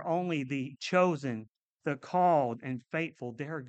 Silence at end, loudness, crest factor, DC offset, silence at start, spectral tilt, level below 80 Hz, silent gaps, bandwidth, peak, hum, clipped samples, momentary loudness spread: 0 s; -31 LUFS; 18 dB; under 0.1%; 0 s; -6.5 dB/octave; -78 dBFS; 1.57-1.76 s; 8.6 kHz; -14 dBFS; none; under 0.1%; 12 LU